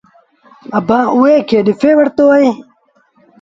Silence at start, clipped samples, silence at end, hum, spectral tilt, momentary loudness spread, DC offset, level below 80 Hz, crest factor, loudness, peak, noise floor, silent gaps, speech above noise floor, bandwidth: 0.7 s; under 0.1%; 0.8 s; none; -7 dB/octave; 8 LU; under 0.1%; -54 dBFS; 12 dB; -11 LUFS; 0 dBFS; -54 dBFS; none; 44 dB; 7.6 kHz